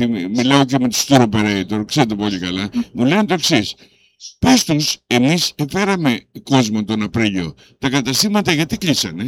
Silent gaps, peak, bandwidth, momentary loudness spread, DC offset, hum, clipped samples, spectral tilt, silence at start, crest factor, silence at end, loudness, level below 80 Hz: none; 0 dBFS; 17 kHz; 8 LU; under 0.1%; none; under 0.1%; -4.5 dB/octave; 0 s; 16 dB; 0 s; -16 LUFS; -46 dBFS